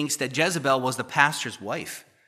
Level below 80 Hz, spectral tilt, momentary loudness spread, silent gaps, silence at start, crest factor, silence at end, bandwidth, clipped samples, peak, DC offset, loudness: -74 dBFS; -3 dB/octave; 11 LU; none; 0 s; 24 dB; 0.25 s; 15.5 kHz; under 0.1%; -2 dBFS; under 0.1%; -24 LUFS